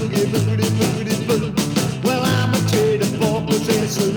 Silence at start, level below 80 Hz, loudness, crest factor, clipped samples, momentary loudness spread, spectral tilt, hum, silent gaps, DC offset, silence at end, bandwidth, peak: 0 s; -46 dBFS; -19 LUFS; 14 dB; under 0.1%; 3 LU; -5.5 dB/octave; none; none; under 0.1%; 0 s; over 20 kHz; -4 dBFS